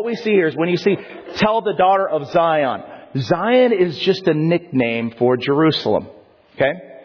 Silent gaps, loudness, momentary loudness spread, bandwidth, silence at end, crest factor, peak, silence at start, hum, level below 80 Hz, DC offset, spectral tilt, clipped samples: none; -18 LUFS; 7 LU; 5.4 kHz; 0.05 s; 14 dB; -4 dBFS; 0 s; none; -56 dBFS; under 0.1%; -7 dB/octave; under 0.1%